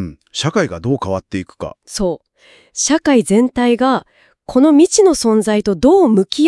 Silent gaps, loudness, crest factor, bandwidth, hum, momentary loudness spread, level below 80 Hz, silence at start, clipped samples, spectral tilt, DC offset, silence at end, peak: none; -14 LUFS; 14 dB; 12 kHz; none; 15 LU; -44 dBFS; 0 s; under 0.1%; -4.5 dB/octave; under 0.1%; 0 s; 0 dBFS